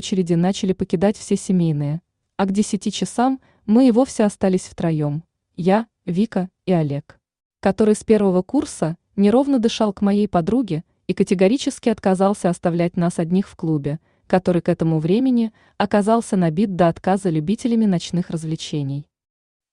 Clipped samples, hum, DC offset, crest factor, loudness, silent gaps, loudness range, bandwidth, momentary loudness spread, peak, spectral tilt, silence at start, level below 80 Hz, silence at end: under 0.1%; none; under 0.1%; 16 dB; -20 LUFS; 7.45-7.50 s; 2 LU; 11 kHz; 9 LU; -4 dBFS; -6.5 dB/octave; 0 s; -52 dBFS; 0.7 s